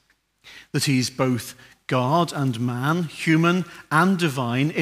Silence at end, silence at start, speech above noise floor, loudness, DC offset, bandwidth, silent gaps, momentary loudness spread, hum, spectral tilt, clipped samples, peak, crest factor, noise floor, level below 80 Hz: 0 s; 0.45 s; 32 dB; -22 LUFS; under 0.1%; 16 kHz; none; 7 LU; none; -5.5 dB/octave; under 0.1%; -4 dBFS; 18 dB; -54 dBFS; -64 dBFS